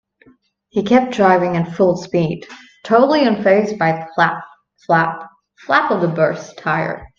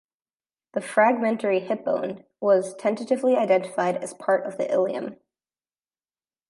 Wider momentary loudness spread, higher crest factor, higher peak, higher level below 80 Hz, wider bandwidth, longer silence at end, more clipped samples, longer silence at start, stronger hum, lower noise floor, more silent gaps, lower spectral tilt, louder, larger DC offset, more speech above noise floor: about the same, 10 LU vs 10 LU; about the same, 16 dB vs 20 dB; first, 0 dBFS vs -6 dBFS; first, -54 dBFS vs -78 dBFS; second, 7.4 kHz vs 11.5 kHz; second, 0.15 s vs 1.35 s; neither; about the same, 0.75 s vs 0.75 s; neither; second, -53 dBFS vs under -90 dBFS; neither; about the same, -6.5 dB/octave vs -5.5 dB/octave; first, -16 LUFS vs -24 LUFS; neither; second, 38 dB vs over 67 dB